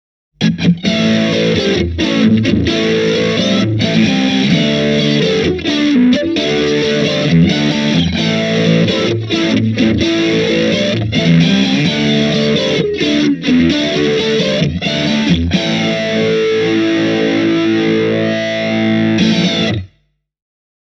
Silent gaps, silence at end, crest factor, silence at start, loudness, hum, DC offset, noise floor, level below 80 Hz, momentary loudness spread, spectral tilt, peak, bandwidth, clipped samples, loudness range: none; 1.15 s; 12 dB; 0.4 s; -13 LUFS; none; under 0.1%; -59 dBFS; -38 dBFS; 3 LU; -5.5 dB/octave; 0 dBFS; 7.8 kHz; under 0.1%; 1 LU